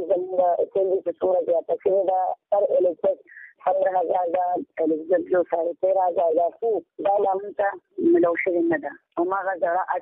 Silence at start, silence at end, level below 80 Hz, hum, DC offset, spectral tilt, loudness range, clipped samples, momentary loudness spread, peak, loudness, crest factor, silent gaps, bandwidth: 0 s; 0 s; -70 dBFS; none; under 0.1%; -10 dB/octave; 1 LU; under 0.1%; 5 LU; -10 dBFS; -23 LUFS; 14 dB; none; 3.7 kHz